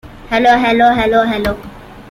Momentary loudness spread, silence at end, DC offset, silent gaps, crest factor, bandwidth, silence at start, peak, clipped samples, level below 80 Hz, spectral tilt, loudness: 9 LU; 0 s; under 0.1%; none; 12 dB; 16 kHz; 0.05 s; -2 dBFS; under 0.1%; -36 dBFS; -5.5 dB/octave; -12 LUFS